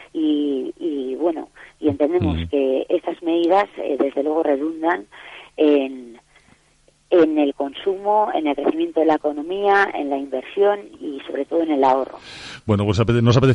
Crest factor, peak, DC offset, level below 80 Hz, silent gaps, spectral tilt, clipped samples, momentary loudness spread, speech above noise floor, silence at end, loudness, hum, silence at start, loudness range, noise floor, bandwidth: 14 dB; -6 dBFS; under 0.1%; -46 dBFS; none; -7.5 dB/octave; under 0.1%; 12 LU; 39 dB; 0 s; -20 LUFS; none; 0 s; 2 LU; -58 dBFS; 10.5 kHz